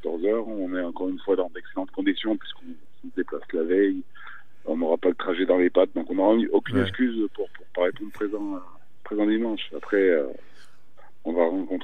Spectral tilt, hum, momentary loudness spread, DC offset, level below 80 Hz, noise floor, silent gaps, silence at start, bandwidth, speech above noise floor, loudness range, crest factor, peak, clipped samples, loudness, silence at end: -7.5 dB/octave; none; 14 LU; 2%; -70 dBFS; -58 dBFS; none; 0.05 s; 9 kHz; 33 dB; 5 LU; 20 dB; -6 dBFS; under 0.1%; -25 LUFS; 0 s